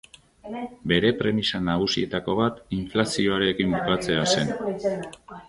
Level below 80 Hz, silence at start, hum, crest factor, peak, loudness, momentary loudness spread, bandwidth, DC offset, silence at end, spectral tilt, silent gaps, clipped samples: -50 dBFS; 0.45 s; none; 20 dB; -4 dBFS; -24 LUFS; 11 LU; 11.5 kHz; under 0.1%; 0.05 s; -4.5 dB/octave; none; under 0.1%